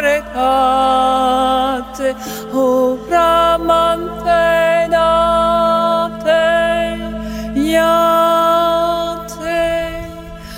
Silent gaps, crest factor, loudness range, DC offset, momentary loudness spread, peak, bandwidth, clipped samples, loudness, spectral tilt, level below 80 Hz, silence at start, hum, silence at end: none; 12 dB; 2 LU; under 0.1%; 10 LU; -2 dBFS; 16.5 kHz; under 0.1%; -14 LUFS; -4.5 dB/octave; -36 dBFS; 0 s; none; 0 s